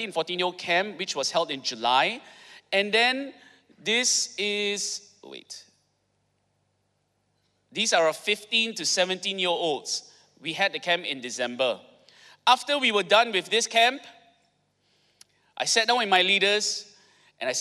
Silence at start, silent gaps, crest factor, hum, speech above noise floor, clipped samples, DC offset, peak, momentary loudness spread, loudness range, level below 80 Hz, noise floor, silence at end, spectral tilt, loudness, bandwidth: 0 s; none; 20 dB; none; 47 dB; under 0.1%; under 0.1%; -8 dBFS; 15 LU; 6 LU; -82 dBFS; -73 dBFS; 0 s; -1 dB/octave; -24 LUFS; 15.5 kHz